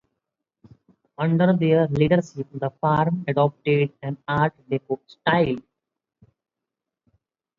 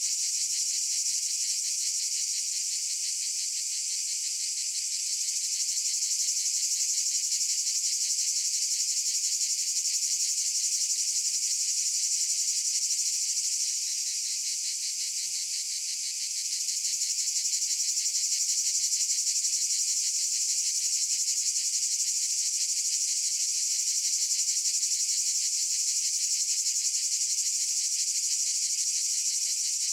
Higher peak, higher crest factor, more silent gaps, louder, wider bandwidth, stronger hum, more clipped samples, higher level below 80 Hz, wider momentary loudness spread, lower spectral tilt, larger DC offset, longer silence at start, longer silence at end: first, -4 dBFS vs -14 dBFS; about the same, 20 dB vs 16 dB; neither; first, -22 LUFS vs -26 LUFS; second, 7.4 kHz vs over 20 kHz; neither; neither; first, -56 dBFS vs -88 dBFS; first, 11 LU vs 4 LU; first, -8.5 dB/octave vs 7 dB/octave; neither; first, 1.2 s vs 0 s; first, 2 s vs 0 s